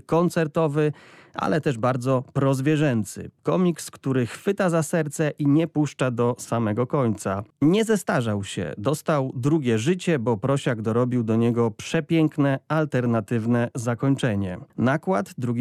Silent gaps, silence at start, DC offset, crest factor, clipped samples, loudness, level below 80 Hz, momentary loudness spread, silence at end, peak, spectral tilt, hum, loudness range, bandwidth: none; 0.1 s; under 0.1%; 12 dB; under 0.1%; -23 LUFS; -60 dBFS; 6 LU; 0 s; -10 dBFS; -6.5 dB/octave; none; 1 LU; 14.5 kHz